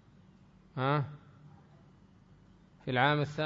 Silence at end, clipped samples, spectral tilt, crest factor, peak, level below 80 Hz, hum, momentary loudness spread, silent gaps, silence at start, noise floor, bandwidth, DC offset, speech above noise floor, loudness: 0 s; under 0.1%; -4.5 dB/octave; 22 dB; -14 dBFS; -68 dBFS; none; 17 LU; none; 0.75 s; -60 dBFS; 7.6 kHz; under 0.1%; 30 dB; -32 LUFS